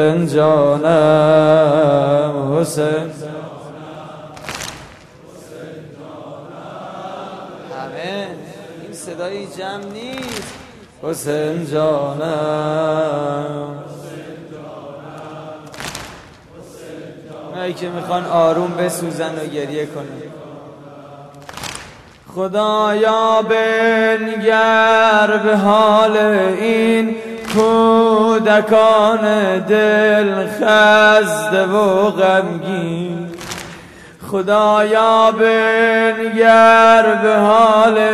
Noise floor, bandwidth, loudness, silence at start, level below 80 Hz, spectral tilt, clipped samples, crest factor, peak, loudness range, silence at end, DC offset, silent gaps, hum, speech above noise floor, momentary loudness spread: -40 dBFS; 13.5 kHz; -14 LUFS; 0 s; -56 dBFS; -5 dB/octave; under 0.1%; 16 dB; 0 dBFS; 18 LU; 0 s; under 0.1%; none; none; 27 dB; 22 LU